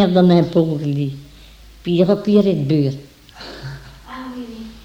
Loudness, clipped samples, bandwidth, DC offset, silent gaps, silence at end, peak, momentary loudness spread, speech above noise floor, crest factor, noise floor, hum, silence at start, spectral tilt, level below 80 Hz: -16 LUFS; under 0.1%; 8.6 kHz; under 0.1%; none; 0.05 s; -2 dBFS; 22 LU; 27 dB; 16 dB; -42 dBFS; none; 0 s; -8.5 dB/octave; -46 dBFS